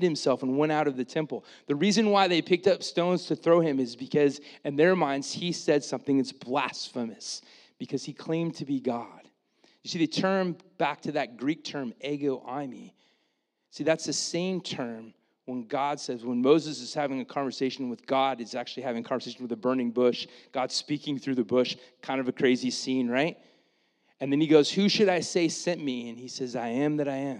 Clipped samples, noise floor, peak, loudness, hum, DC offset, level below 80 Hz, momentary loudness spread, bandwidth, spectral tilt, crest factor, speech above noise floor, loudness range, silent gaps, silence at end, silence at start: under 0.1%; -76 dBFS; -8 dBFS; -28 LUFS; none; under 0.1%; -86 dBFS; 13 LU; 11 kHz; -5 dB/octave; 22 dB; 48 dB; 7 LU; none; 0 s; 0 s